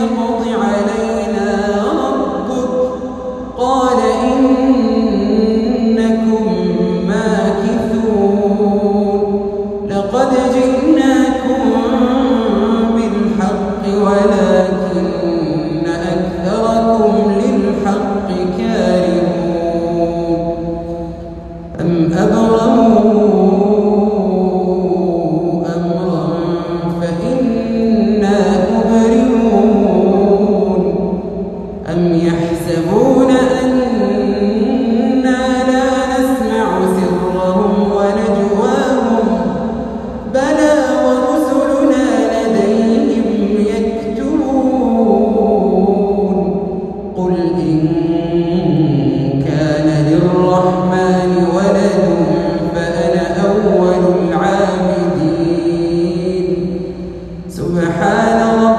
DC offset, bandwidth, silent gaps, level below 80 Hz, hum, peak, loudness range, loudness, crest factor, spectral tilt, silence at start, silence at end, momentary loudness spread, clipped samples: under 0.1%; 12.5 kHz; none; -36 dBFS; none; 0 dBFS; 3 LU; -14 LUFS; 12 dB; -7 dB/octave; 0 s; 0 s; 7 LU; under 0.1%